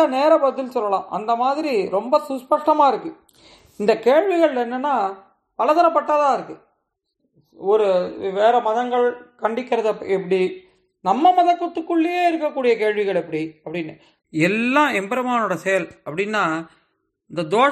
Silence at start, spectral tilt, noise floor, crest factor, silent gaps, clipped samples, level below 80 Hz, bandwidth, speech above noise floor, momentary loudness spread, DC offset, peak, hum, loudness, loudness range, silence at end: 0 s; -5.5 dB/octave; -74 dBFS; 16 dB; none; under 0.1%; -70 dBFS; 13 kHz; 55 dB; 12 LU; under 0.1%; -4 dBFS; none; -20 LUFS; 2 LU; 0 s